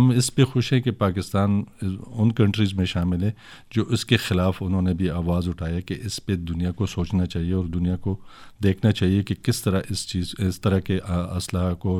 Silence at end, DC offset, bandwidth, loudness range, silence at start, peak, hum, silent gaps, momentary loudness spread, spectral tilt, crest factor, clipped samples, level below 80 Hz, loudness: 0 s; under 0.1%; 16 kHz; 3 LU; 0 s; -4 dBFS; none; none; 8 LU; -6 dB/octave; 18 dB; under 0.1%; -42 dBFS; -24 LUFS